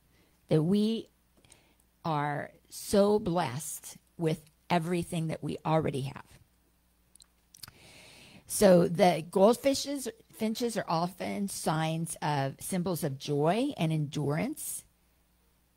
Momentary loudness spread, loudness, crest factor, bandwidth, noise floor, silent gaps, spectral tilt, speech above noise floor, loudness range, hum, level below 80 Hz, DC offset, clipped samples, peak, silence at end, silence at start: 15 LU; -30 LUFS; 22 dB; 16 kHz; -69 dBFS; none; -5.5 dB/octave; 39 dB; 7 LU; none; -62 dBFS; under 0.1%; under 0.1%; -8 dBFS; 0.95 s; 0.5 s